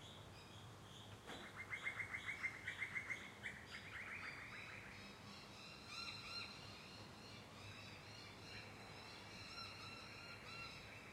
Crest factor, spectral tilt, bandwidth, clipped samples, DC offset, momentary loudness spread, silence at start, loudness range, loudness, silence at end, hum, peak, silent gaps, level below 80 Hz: 20 dB; -3 dB/octave; 16 kHz; under 0.1%; under 0.1%; 11 LU; 0 s; 6 LU; -51 LUFS; 0 s; none; -32 dBFS; none; -74 dBFS